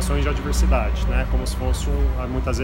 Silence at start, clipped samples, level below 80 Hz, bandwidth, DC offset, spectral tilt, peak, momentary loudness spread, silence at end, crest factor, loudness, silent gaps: 0 s; under 0.1%; -22 dBFS; 16 kHz; under 0.1%; -5.5 dB/octave; -6 dBFS; 4 LU; 0 s; 14 dB; -23 LUFS; none